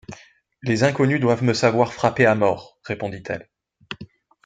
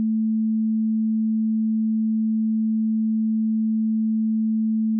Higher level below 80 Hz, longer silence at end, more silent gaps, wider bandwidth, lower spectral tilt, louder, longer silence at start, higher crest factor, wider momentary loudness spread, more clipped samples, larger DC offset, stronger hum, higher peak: first, -60 dBFS vs under -90 dBFS; first, 0.4 s vs 0 s; neither; first, 9.2 kHz vs 0.3 kHz; second, -6 dB/octave vs -25 dB/octave; about the same, -21 LUFS vs -22 LUFS; about the same, 0.1 s vs 0 s; first, 20 dB vs 4 dB; first, 19 LU vs 0 LU; neither; neither; neither; first, -2 dBFS vs -18 dBFS